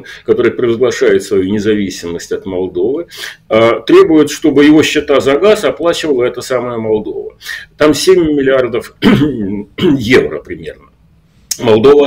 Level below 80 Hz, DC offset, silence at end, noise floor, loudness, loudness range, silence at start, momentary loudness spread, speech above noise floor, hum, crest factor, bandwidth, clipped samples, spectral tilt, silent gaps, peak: -40 dBFS; under 0.1%; 0 s; -48 dBFS; -11 LUFS; 4 LU; 0.05 s; 14 LU; 37 dB; none; 12 dB; 16.5 kHz; under 0.1%; -5 dB/octave; none; 0 dBFS